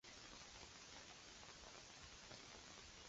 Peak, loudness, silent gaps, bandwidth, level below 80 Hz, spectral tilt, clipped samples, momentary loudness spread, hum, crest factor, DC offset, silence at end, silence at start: -40 dBFS; -58 LUFS; none; 8 kHz; -72 dBFS; -1.5 dB/octave; under 0.1%; 1 LU; none; 20 dB; under 0.1%; 0 s; 0.05 s